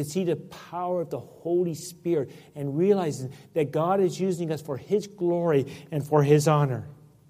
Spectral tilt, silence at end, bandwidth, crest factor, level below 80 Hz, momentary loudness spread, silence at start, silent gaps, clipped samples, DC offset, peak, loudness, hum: -7 dB/octave; 0.35 s; 15.5 kHz; 18 dB; -66 dBFS; 13 LU; 0 s; none; under 0.1%; under 0.1%; -8 dBFS; -26 LUFS; none